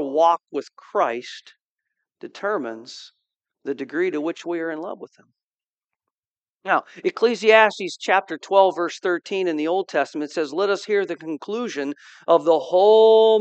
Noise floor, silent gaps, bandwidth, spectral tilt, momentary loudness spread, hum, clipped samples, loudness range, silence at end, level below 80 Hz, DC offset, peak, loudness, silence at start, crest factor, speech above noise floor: under -90 dBFS; 1.61-1.78 s, 5.43-5.58 s, 5.68-5.78 s, 5.84-5.88 s, 6.11-6.41 s, 6.49-6.57 s; 8.6 kHz; -4 dB/octave; 18 LU; none; under 0.1%; 10 LU; 0 s; -88 dBFS; under 0.1%; 0 dBFS; -21 LUFS; 0 s; 22 dB; over 69 dB